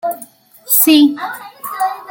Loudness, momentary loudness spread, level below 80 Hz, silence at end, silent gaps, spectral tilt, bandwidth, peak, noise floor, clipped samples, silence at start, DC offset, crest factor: -12 LUFS; 19 LU; -68 dBFS; 0 s; none; -1 dB/octave; 17.5 kHz; 0 dBFS; -40 dBFS; under 0.1%; 0.05 s; under 0.1%; 16 dB